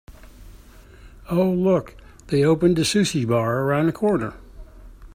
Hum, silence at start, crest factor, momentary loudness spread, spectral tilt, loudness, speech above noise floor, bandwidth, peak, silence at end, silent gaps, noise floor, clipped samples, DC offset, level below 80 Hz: none; 0.1 s; 18 dB; 7 LU; -6 dB/octave; -21 LUFS; 26 dB; 16 kHz; -4 dBFS; 0 s; none; -45 dBFS; under 0.1%; under 0.1%; -46 dBFS